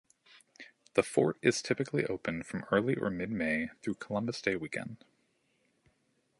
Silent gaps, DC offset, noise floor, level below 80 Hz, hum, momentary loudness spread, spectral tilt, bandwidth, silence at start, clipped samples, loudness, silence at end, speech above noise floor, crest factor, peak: none; under 0.1%; -75 dBFS; -66 dBFS; none; 14 LU; -5 dB/octave; 11.5 kHz; 0.6 s; under 0.1%; -33 LUFS; 1.45 s; 42 dB; 24 dB; -10 dBFS